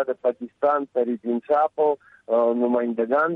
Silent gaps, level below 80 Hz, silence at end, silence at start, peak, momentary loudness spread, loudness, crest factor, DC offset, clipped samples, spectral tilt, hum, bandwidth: none; -74 dBFS; 0 s; 0 s; -10 dBFS; 5 LU; -23 LUFS; 12 dB; under 0.1%; under 0.1%; -8.5 dB/octave; none; 4.2 kHz